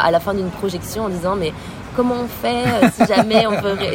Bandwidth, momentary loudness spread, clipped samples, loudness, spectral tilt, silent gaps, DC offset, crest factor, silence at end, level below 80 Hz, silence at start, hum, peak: 16.5 kHz; 10 LU; under 0.1%; -18 LUFS; -5.5 dB/octave; none; under 0.1%; 18 dB; 0 s; -42 dBFS; 0 s; none; 0 dBFS